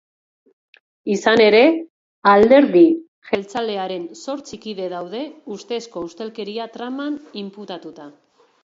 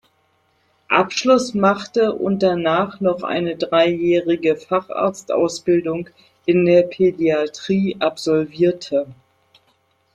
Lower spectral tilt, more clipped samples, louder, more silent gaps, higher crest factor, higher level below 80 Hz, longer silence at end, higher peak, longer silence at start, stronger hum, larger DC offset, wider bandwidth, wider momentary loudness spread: about the same, -5 dB/octave vs -5.5 dB/octave; neither; about the same, -18 LUFS vs -19 LUFS; first, 1.90-2.22 s, 3.08-3.22 s vs none; about the same, 18 dB vs 16 dB; about the same, -58 dBFS vs -60 dBFS; second, 0.55 s vs 1 s; about the same, 0 dBFS vs -2 dBFS; first, 1.05 s vs 0.9 s; neither; neither; second, 7.8 kHz vs 10.5 kHz; first, 20 LU vs 7 LU